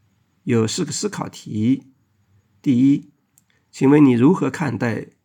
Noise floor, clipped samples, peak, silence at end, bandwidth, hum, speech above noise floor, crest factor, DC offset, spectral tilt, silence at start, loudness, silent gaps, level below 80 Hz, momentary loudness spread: -61 dBFS; under 0.1%; -2 dBFS; 0.2 s; 11 kHz; none; 44 dB; 16 dB; under 0.1%; -6 dB/octave; 0.45 s; -19 LUFS; none; -66 dBFS; 13 LU